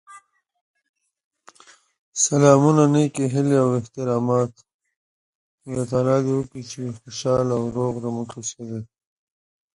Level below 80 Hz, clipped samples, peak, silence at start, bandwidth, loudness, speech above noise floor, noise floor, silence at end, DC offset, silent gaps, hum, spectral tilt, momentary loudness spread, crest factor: -58 dBFS; under 0.1%; 0 dBFS; 0.1 s; 11.5 kHz; -21 LUFS; 32 dB; -53 dBFS; 0.9 s; under 0.1%; 0.61-0.74 s, 0.89-0.94 s, 1.24-1.31 s, 1.98-2.12 s, 4.74-4.79 s, 4.96-5.58 s; none; -6 dB/octave; 17 LU; 22 dB